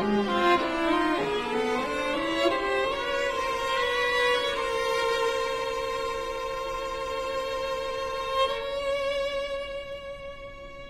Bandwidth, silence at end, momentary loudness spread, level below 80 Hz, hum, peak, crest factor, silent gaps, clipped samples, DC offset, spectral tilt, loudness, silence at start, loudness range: 15.5 kHz; 0 s; 9 LU; -48 dBFS; none; -12 dBFS; 16 dB; none; under 0.1%; under 0.1%; -3.5 dB/octave; -27 LUFS; 0 s; 4 LU